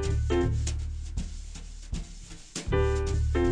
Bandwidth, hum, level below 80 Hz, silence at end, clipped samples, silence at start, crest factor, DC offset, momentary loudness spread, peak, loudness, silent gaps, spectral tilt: 10 kHz; none; -32 dBFS; 0 s; under 0.1%; 0 s; 16 dB; under 0.1%; 17 LU; -12 dBFS; -30 LUFS; none; -6 dB/octave